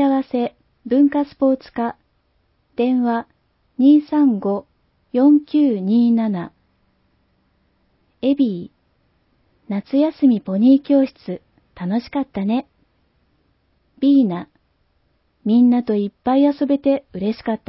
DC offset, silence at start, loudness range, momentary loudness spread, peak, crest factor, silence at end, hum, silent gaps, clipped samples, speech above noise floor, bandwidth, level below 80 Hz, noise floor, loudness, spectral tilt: under 0.1%; 0 s; 6 LU; 13 LU; -4 dBFS; 16 dB; 0.1 s; none; none; under 0.1%; 47 dB; 5.8 kHz; -60 dBFS; -64 dBFS; -18 LUFS; -12 dB/octave